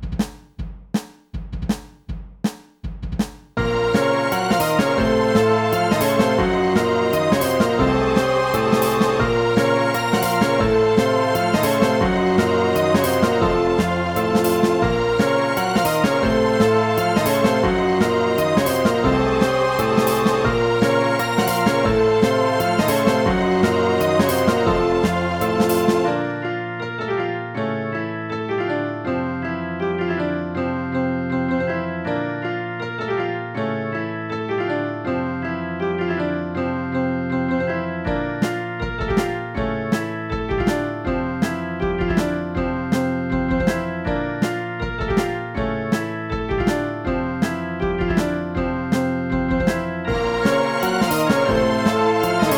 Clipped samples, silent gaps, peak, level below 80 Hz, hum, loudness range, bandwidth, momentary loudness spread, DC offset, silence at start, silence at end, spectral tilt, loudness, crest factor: under 0.1%; none; -2 dBFS; -36 dBFS; none; 6 LU; 19 kHz; 8 LU; under 0.1%; 0 s; 0 s; -6 dB/octave; -20 LUFS; 18 dB